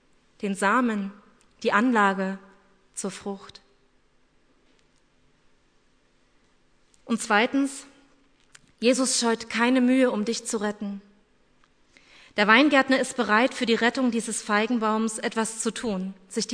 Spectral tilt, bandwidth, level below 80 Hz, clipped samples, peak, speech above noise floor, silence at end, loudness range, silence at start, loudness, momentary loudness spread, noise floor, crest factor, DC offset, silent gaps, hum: -3.5 dB/octave; 11 kHz; -66 dBFS; under 0.1%; -2 dBFS; 39 dB; 0 s; 15 LU; 0.4 s; -24 LUFS; 14 LU; -63 dBFS; 24 dB; under 0.1%; none; none